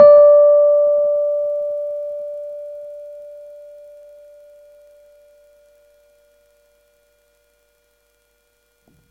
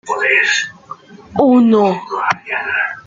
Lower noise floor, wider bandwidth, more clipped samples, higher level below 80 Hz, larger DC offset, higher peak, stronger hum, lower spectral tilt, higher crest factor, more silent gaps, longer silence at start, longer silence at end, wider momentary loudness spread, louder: first, -63 dBFS vs -35 dBFS; second, 4.5 kHz vs 7.6 kHz; neither; second, -66 dBFS vs -58 dBFS; neither; about the same, 0 dBFS vs -2 dBFS; neither; first, -6.5 dB/octave vs -4.5 dB/octave; about the same, 18 dB vs 14 dB; neither; about the same, 0 s vs 0.05 s; first, 5.7 s vs 0.05 s; first, 28 LU vs 11 LU; about the same, -14 LUFS vs -14 LUFS